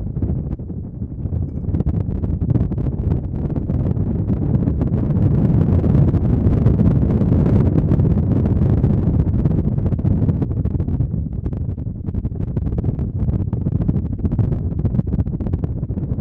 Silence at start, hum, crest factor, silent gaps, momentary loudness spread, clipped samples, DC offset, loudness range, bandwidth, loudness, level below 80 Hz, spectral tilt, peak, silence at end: 0 s; none; 16 dB; none; 9 LU; under 0.1%; under 0.1%; 6 LU; 3.5 kHz; -19 LUFS; -26 dBFS; -12.5 dB/octave; -2 dBFS; 0 s